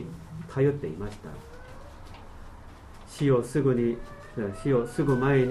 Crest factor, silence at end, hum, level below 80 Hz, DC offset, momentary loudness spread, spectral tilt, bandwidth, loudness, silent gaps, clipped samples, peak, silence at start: 16 dB; 0 s; none; -46 dBFS; under 0.1%; 24 LU; -8 dB/octave; 12.5 kHz; -27 LUFS; none; under 0.1%; -12 dBFS; 0 s